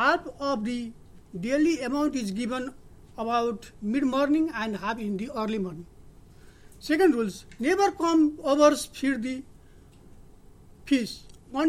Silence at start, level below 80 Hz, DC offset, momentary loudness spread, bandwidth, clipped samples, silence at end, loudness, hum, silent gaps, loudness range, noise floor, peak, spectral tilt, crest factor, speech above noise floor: 0 s; -54 dBFS; under 0.1%; 14 LU; 14.5 kHz; under 0.1%; 0 s; -26 LUFS; none; none; 5 LU; -52 dBFS; -8 dBFS; -5 dB/octave; 20 dB; 26 dB